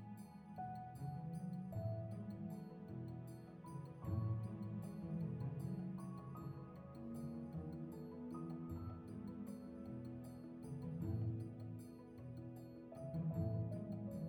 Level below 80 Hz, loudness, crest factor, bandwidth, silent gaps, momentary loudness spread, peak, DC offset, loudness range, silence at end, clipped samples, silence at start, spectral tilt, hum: -68 dBFS; -48 LUFS; 16 dB; 17.5 kHz; none; 10 LU; -30 dBFS; under 0.1%; 3 LU; 0 s; under 0.1%; 0 s; -9.5 dB/octave; none